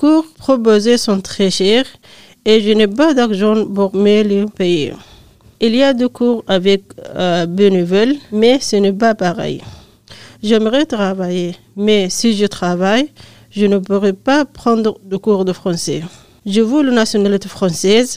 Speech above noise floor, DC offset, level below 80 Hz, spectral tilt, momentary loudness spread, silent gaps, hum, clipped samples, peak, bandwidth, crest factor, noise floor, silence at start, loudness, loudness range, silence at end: 30 dB; 1%; -50 dBFS; -5 dB/octave; 8 LU; none; none; under 0.1%; 0 dBFS; 15.5 kHz; 14 dB; -44 dBFS; 0 s; -14 LUFS; 3 LU; 0 s